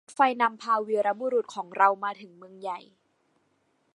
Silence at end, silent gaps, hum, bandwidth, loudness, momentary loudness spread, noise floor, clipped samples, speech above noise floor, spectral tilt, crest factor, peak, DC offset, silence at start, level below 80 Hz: 1.15 s; none; none; 11 kHz; -26 LUFS; 15 LU; -71 dBFS; under 0.1%; 44 dB; -4 dB/octave; 22 dB; -6 dBFS; under 0.1%; 0.1 s; -86 dBFS